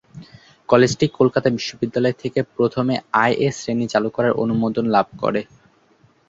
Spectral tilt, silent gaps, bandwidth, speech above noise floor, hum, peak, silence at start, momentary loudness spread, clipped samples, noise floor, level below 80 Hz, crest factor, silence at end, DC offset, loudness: -6 dB/octave; none; 7.8 kHz; 38 dB; none; -2 dBFS; 0.15 s; 7 LU; under 0.1%; -57 dBFS; -54 dBFS; 18 dB; 0.85 s; under 0.1%; -19 LUFS